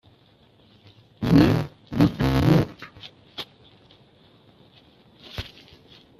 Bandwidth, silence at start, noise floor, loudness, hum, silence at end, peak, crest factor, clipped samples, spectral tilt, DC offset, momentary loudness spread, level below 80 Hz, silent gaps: 14.5 kHz; 1.2 s; -57 dBFS; -21 LUFS; none; 0.75 s; -2 dBFS; 22 dB; under 0.1%; -7.5 dB/octave; under 0.1%; 23 LU; -42 dBFS; none